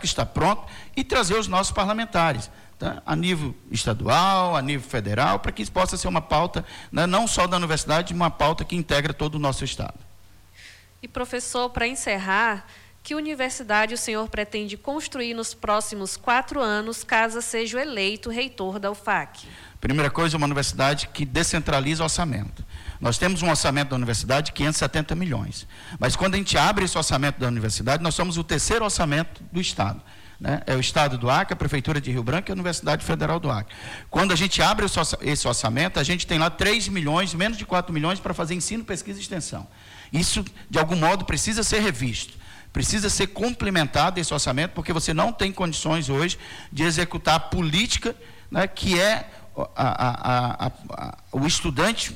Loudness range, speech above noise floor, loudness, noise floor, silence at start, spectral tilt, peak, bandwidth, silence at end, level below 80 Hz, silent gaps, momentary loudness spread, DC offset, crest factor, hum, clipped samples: 4 LU; 28 dB; -24 LUFS; -52 dBFS; 0 s; -4 dB/octave; -8 dBFS; 16.5 kHz; 0 s; -40 dBFS; none; 10 LU; under 0.1%; 16 dB; none; under 0.1%